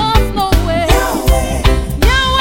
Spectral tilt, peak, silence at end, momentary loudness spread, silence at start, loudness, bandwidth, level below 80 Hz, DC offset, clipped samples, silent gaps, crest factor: -4.5 dB/octave; 0 dBFS; 0 s; 2 LU; 0 s; -13 LUFS; 17 kHz; -14 dBFS; 1%; under 0.1%; none; 12 dB